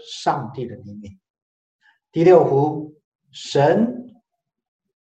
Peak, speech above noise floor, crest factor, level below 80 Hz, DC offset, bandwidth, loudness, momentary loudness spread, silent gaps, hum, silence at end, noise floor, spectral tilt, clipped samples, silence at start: -2 dBFS; 53 dB; 20 dB; -66 dBFS; under 0.1%; 8.6 kHz; -18 LUFS; 24 LU; 1.30-1.34 s, 1.42-1.79 s, 3.04-3.19 s; none; 1.1 s; -71 dBFS; -7 dB/octave; under 0.1%; 0.05 s